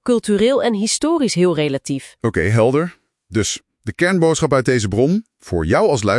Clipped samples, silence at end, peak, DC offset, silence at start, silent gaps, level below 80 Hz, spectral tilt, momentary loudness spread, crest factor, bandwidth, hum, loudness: under 0.1%; 0 s; -2 dBFS; under 0.1%; 0.05 s; none; -46 dBFS; -5 dB/octave; 9 LU; 16 dB; 12 kHz; none; -17 LUFS